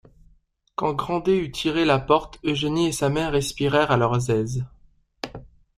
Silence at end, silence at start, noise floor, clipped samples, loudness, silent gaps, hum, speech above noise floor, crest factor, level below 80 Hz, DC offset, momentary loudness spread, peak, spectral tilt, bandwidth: 0.3 s; 0.8 s; -61 dBFS; under 0.1%; -23 LUFS; none; none; 39 dB; 20 dB; -46 dBFS; under 0.1%; 16 LU; -4 dBFS; -5.5 dB/octave; 15 kHz